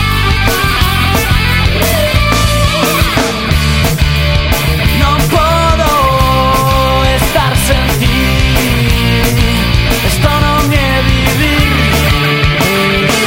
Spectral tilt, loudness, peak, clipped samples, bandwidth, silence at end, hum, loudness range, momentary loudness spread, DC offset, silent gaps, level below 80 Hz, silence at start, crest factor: -4.5 dB/octave; -10 LUFS; 0 dBFS; under 0.1%; 17 kHz; 0 s; none; 1 LU; 2 LU; under 0.1%; none; -16 dBFS; 0 s; 10 dB